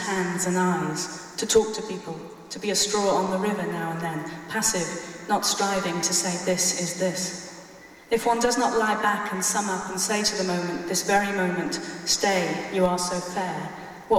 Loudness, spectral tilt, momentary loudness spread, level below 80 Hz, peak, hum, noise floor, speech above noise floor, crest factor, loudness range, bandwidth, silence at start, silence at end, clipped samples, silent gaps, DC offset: -25 LUFS; -3 dB/octave; 10 LU; -58 dBFS; -6 dBFS; none; -46 dBFS; 21 dB; 18 dB; 2 LU; 17 kHz; 0 s; 0 s; under 0.1%; none; under 0.1%